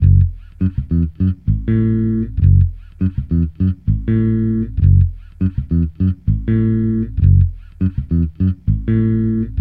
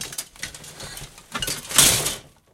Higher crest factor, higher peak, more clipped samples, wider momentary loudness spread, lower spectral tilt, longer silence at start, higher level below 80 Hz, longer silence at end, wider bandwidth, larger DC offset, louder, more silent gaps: second, 14 dB vs 24 dB; about the same, -2 dBFS vs 0 dBFS; neither; second, 8 LU vs 21 LU; first, -13 dB/octave vs -0.5 dB/octave; about the same, 0 s vs 0 s; first, -24 dBFS vs -46 dBFS; second, 0 s vs 0.3 s; second, 3.3 kHz vs 17 kHz; neither; about the same, -17 LUFS vs -19 LUFS; neither